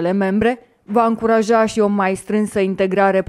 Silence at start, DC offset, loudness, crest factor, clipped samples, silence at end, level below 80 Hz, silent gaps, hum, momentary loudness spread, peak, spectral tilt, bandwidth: 0 s; under 0.1%; -17 LUFS; 14 dB; under 0.1%; 0.05 s; -48 dBFS; none; none; 5 LU; -2 dBFS; -6.5 dB/octave; 13 kHz